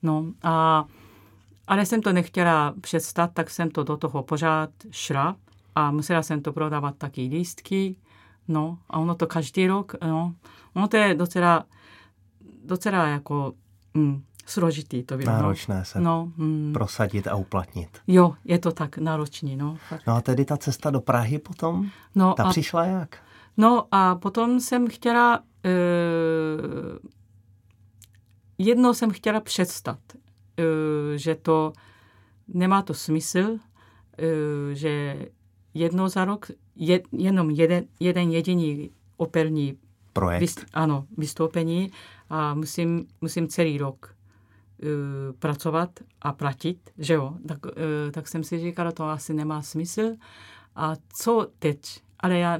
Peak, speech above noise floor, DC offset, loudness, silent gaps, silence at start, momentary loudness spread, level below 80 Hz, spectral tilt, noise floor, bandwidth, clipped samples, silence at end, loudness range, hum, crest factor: -4 dBFS; 33 dB; under 0.1%; -25 LUFS; none; 0.05 s; 12 LU; -58 dBFS; -6 dB/octave; -57 dBFS; 17 kHz; under 0.1%; 0 s; 6 LU; none; 20 dB